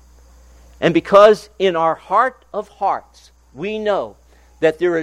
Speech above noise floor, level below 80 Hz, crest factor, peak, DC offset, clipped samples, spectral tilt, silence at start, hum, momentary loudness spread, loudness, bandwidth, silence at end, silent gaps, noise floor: 30 dB; -50 dBFS; 18 dB; 0 dBFS; under 0.1%; under 0.1%; -6 dB/octave; 0.8 s; none; 17 LU; -16 LUFS; 11.5 kHz; 0 s; none; -46 dBFS